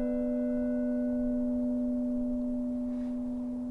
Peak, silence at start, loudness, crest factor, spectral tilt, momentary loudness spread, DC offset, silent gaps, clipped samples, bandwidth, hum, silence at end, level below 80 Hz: -22 dBFS; 0 s; -32 LUFS; 10 dB; -9 dB/octave; 4 LU; under 0.1%; none; under 0.1%; 2.8 kHz; none; 0 s; -48 dBFS